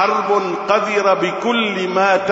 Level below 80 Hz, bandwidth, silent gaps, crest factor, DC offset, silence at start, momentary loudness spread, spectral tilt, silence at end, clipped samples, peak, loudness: -64 dBFS; 8 kHz; none; 14 dB; under 0.1%; 0 s; 3 LU; -4.5 dB/octave; 0 s; under 0.1%; -2 dBFS; -16 LUFS